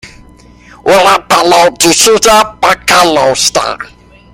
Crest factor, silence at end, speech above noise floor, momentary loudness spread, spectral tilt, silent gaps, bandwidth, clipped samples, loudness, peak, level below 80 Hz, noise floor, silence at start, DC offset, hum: 10 dB; 0.5 s; 30 dB; 11 LU; -1.5 dB/octave; none; over 20 kHz; 0.3%; -7 LUFS; 0 dBFS; -38 dBFS; -37 dBFS; 0.05 s; under 0.1%; 60 Hz at -40 dBFS